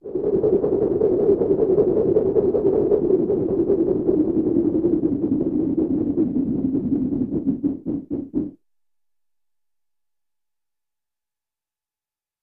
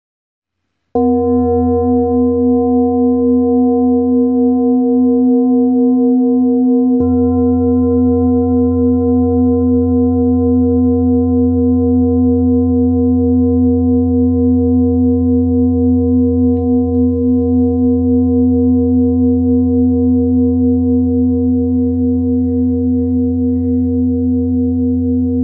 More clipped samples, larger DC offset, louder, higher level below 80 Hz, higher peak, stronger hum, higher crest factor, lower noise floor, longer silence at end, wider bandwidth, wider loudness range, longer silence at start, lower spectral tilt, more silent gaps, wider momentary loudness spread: neither; neither; second, -21 LUFS vs -13 LUFS; second, -48 dBFS vs -38 dBFS; about the same, -6 dBFS vs -4 dBFS; neither; first, 16 dB vs 8 dB; first, under -90 dBFS vs -71 dBFS; first, 3.9 s vs 0 s; first, 2.6 kHz vs 1.4 kHz; first, 11 LU vs 2 LU; second, 0.05 s vs 0.95 s; second, -13 dB/octave vs -16 dB/octave; neither; first, 7 LU vs 3 LU